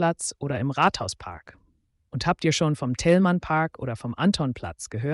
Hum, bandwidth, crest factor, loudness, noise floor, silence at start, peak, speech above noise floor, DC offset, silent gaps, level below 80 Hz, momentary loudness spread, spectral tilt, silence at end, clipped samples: none; 11.5 kHz; 16 dB; -25 LUFS; -67 dBFS; 0 s; -8 dBFS; 42 dB; under 0.1%; none; -50 dBFS; 13 LU; -5.5 dB/octave; 0 s; under 0.1%